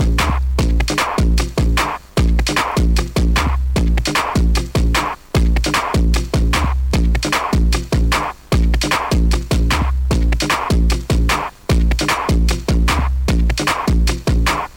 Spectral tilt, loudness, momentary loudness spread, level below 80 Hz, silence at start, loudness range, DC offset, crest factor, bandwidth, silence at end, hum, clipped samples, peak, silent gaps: -5 dB/octave; -17 LUFS; 2 LU; -18 dBFS; 0 s; 0 LU; under 0.1%; 8 dB; 16.5 kHz; 0 s; none; under 0.1%; -6 dBFS; none